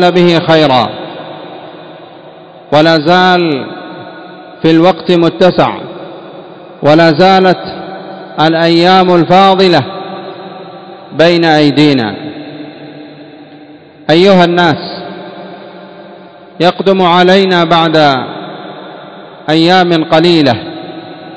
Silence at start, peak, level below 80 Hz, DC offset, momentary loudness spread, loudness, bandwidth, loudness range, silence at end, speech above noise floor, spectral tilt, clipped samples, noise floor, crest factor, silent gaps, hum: 0 s; 0 dBFS; -50 dBFS; under 0.1%; 22 LU; -8 LUFS; 8 kHz; 4 LU; 0 s; 28 dB; -6.5 dB/octave; 2%; -35 dBFS; 10 dB; none; none